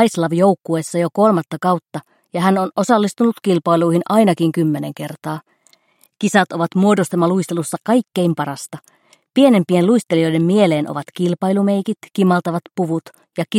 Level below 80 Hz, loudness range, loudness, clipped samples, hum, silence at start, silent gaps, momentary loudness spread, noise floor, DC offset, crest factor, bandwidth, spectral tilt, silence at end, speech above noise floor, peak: -66 dBFS; 2 LU; -17 LUFS; under 0.1%; none; 0 s; none; 12 LU; -56 dBFS; under 0.1%; 16 dB; 16 kHz; -6.5 dB/octave; 0 s; 40 dB; 0 dBFS